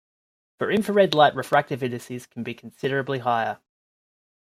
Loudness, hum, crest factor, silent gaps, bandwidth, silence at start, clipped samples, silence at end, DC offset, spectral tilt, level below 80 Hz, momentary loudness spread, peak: -23 LUFS; none; 20 dB; none; 15.5 kHz; 0.6 s; under 0.1%; 0.95 s; under 0.1%; -5.5 dB/octave; -68 dBFS; 16 LU; -4 dBFS